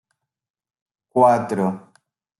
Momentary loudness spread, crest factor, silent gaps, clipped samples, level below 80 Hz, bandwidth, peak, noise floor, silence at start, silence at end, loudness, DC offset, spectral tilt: 11 LU; 20 dB; none; under 0.1%; -70 dBFS; 12 kHz; -2 dBFS; -63 dBFS; 1.15 s; 0.6 s; -19 LUFS; under 0.1%; -7.5 dB/octave